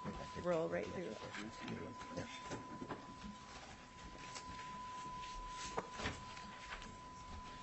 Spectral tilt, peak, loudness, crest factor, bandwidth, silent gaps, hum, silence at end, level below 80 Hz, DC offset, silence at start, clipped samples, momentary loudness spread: -4.5 dB/octave; -26 dBFS; -47 LUFS; 22 dB; 8.2 kHz; none; none; 0 s; -62 dBFS; under 0.1%; 0 s; under 0.1%; 11 LU